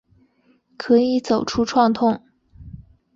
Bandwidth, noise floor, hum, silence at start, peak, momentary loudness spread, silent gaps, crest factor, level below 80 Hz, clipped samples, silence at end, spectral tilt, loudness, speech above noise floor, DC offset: 7.6 kHz; -60 dBFS; none; 0.8 s; -4 dBFS; 8 LU; none; 16 dB; -50 dBFS; under 0.1%; 0.35 s; -5.5 dB/octave; -19 LUFS; 42 dB; under 0.1%